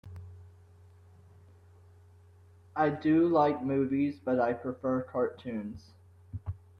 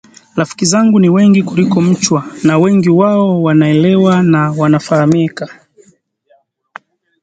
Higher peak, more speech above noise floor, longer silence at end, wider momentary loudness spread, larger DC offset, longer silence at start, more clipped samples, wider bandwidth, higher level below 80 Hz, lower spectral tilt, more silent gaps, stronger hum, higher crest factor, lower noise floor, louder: second, -14 dBFS vs 0 dBFS; second, 29 dB vs 44 dB; second, 0.2 s vs 1.7 s; first, 21 LU vs 8 LU; neither; second, 0.05 s vs 0.35 s; neither; second, 6.4 kHz vs 9.2 kHz; second, -64 dBFS vs -52 dBFS; first, -9 dB/octave vs -6 dB/octave; neither; neither; first, 18 dB vs 12 dB; about the same, -57 dBFS vs -54 dBFS; second, -30 LUFS vs -11 LUFS